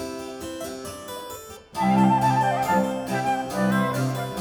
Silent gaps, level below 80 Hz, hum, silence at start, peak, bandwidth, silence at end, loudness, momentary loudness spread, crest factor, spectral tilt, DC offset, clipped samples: none; -54 dBFS; none; 0 s; -8 dBFS; 19.5 kHz; 0 s; -23 LUFS; 16 LU; 16 dB; -6 dB/octave; under 0.1%; under 0.1%